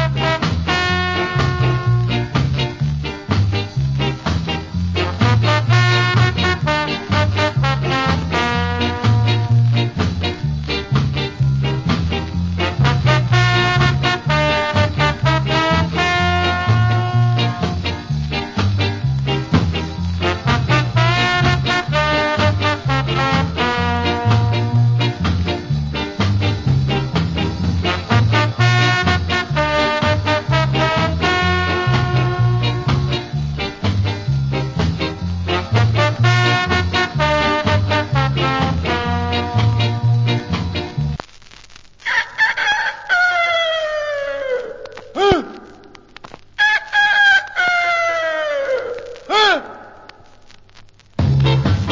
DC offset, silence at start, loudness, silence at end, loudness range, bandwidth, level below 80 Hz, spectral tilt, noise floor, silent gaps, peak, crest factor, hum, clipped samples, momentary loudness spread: under 0.1%; 0 s; -17 LUFS; 0 s; 4 LU; 7.6 kHz; -30 dBFS; -6 dB/octave; -44 dBFS; none; 0 dBFS; 16 dB; none; under 0.1%; 7 LU